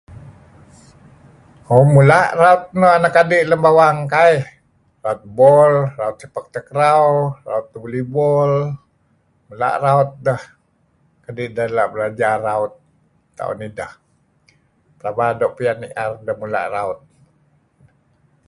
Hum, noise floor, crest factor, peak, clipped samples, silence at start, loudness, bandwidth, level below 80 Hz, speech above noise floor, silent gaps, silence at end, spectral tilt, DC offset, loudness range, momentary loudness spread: none; -60 dBFS; 18 dB; 0 dBFS; under 0.1%; 0.1 s; -16 LUFS; 11.5 kHz; -54 dBFS; 45 dB; none; 1.55 s; -7 dB/octave; under 0.1%; 11 LU; 16 LU